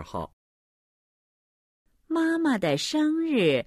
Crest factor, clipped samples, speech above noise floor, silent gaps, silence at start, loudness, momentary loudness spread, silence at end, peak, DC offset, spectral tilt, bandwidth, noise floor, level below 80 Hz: 16 dB; under 0.1%; over 65 dB; 0.33-1.85 s; 0 s; -25 LUFS; 13 LU; 0.05 s; -10 dBFS; under 0.1%; -5 dB/octave; 13 kHz; under -90 dBFS; -60 dBFS